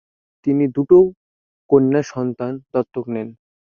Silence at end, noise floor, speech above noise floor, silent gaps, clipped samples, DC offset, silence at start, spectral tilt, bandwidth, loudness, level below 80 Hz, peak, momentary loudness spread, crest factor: 0.45 s; under -90 dBFS; over 73 dB; 1.17-1.69 s; under 0.1%; under 0.1%; 0.45 s; -8.5 dB/octave; 7 kHz; -18 LUFS; -56 dBFS; -2 dBFS; 14 LU; 16 dB